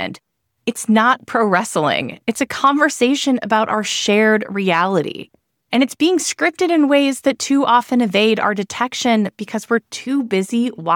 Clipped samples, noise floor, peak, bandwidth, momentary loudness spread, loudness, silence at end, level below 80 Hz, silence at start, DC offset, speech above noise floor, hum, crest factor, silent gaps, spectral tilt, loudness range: under 0.1%; -61 dBFS; -2 dBFS; 17.5 kHz; 7 LU; -17 LUFS; 0 s; -64 dBFS; 0 s; under 0.1%; 44 dB; none; 14 dB; none; -4 dB/octave; 1 LU